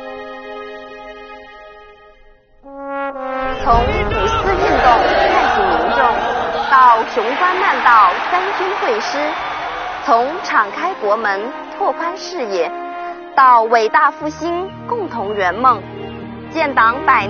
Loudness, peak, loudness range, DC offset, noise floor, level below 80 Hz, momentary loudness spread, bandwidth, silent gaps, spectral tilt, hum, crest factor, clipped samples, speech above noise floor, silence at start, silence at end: -15 LUFS; 0 dBFS; 7 LU; under 0.1%; -46 dBFS; -34 dBFS; 19 LU; 6.8 kHz; none; -2 dB/octave; none; 16 dB; under 0.1%; 32 dB; 0 s; 0 s